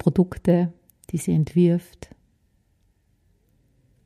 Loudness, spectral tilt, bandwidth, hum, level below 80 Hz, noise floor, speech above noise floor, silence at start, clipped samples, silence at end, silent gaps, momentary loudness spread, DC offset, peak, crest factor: -22 LUFS; -8.5 dB/octave; 13.5 kHz; none; -50 dBFS; -65 dBFS; 44 dB; 0.05 s; under 0.1%; 2.25 s; none; 10 LU; under 0.1%; -6 dBFS; 18 dB